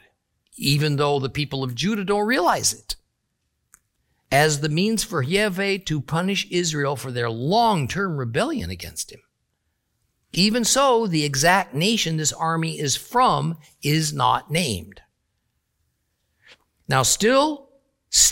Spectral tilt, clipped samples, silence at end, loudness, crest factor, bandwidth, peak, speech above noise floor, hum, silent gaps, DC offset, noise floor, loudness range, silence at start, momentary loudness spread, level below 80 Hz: -3.5 dB/octave; under 0.1%; 0 s; -21 LUFS; 20 dB; 17 kHz; -2 dBFS; 53 dB; none; none; under 0.1%; -74 dBFS; 5 LU; 0.55 s; 10 LU; -50 dBFS